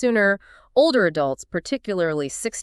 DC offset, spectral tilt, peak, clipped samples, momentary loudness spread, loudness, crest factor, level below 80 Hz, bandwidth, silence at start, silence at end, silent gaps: under 0.1%; -4 dB/octave; -6 dBFS; under 0.1%; 9 LU; -22 LUFS; 16 dB; -56 dBFS; 13 kHz; 0 s; 0 s; none